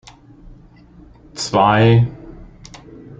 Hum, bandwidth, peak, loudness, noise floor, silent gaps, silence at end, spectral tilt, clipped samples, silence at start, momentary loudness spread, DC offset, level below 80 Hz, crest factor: none; 8.8 kHz; -2 dBFS; -15 LUFS; -44 dBFS; none; 0.05 s; -6 dB/octave; under 0.1%; 1.35 s; 26 LU; under 0.1%; -44 dBFS; 18 dB